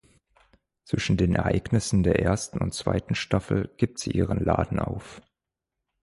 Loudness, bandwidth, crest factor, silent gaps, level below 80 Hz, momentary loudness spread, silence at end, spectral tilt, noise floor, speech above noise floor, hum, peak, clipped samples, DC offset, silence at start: -26 LUFS; 11.5 kHz; 18 dB; none; -40 dBFS; 7 LU; 0.85 s; -6 dB/octave; -86 dBFS; 61 dB; none; -8 dBFS; under 0.1%; under 0.1%; 0.9 s